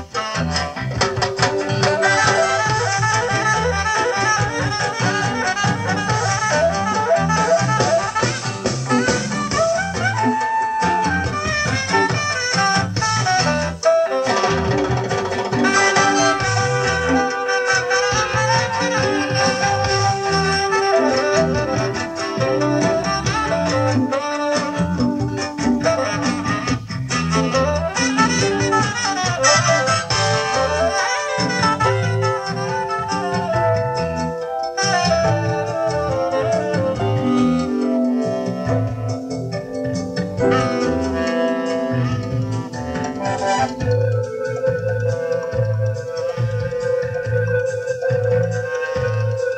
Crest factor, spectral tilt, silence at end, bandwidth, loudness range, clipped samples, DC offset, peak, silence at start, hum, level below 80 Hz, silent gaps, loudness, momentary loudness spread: 18 dB; -4.5 dB/octave; 0 s; 9.8 kHz; 4 LU; under 0.1%; under 0.1%; -2 dBFS; 0 s; none; -42 dBFS; none; -19 LUFS; 6 LU